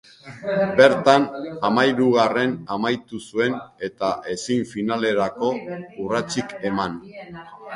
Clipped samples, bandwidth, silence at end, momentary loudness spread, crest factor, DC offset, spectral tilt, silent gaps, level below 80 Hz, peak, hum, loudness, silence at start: under 0.1%; 11.5 kHz; 0 s; 16 LU; 22 dB; under 0.1%; -5 dB/octave; none; -60 dBFS; 0 dBFS; none; -21 LUFS; 0.25 s